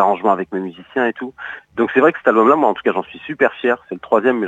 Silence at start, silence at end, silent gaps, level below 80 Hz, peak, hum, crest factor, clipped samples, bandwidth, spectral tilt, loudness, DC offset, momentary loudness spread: 0 s; 0 s; none; -62 dBFS; 0 dBFS; none; 16 dB; under 0.1%; 8 kHz; -7 dB/octave; -17 LUFS; under 0.1%; 15 LU